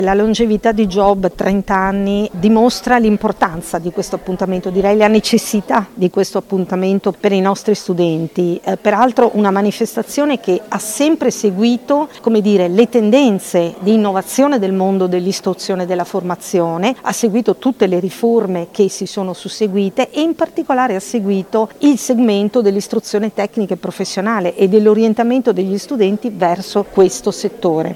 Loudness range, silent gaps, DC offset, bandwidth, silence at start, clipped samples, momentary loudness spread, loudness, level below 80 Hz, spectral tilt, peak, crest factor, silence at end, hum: 3 LU; none; under 0.1%; 16 kHz; 0 s; under 0.1%; 7 LU; -15 LUFS; -44 dBFS; -5.5 dB/octave; 0 dBFS; 14 dB; 0 s; none